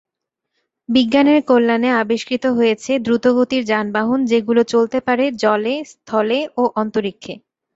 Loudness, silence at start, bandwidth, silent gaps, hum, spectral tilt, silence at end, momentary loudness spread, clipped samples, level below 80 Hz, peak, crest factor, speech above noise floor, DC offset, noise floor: -17 LUFS; 0.9 s; 8 kHz; none; none; -5 dB/octave; 0.35 s; 9 LU; under 0.1%; -60 dBFS; 0 dBFS; 16 dB; 62 dB; under 0.1%; -79 dBFS